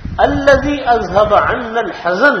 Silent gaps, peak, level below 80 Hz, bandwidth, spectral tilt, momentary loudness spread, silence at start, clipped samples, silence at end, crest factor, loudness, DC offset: none; 0 dBFS; -32 dBFS; 8.2 kHz; -5.5 dB/octave; 7 LU; 0 s; 0.3%; 0 s; 12 dB; -13 LUFS; under 0.1%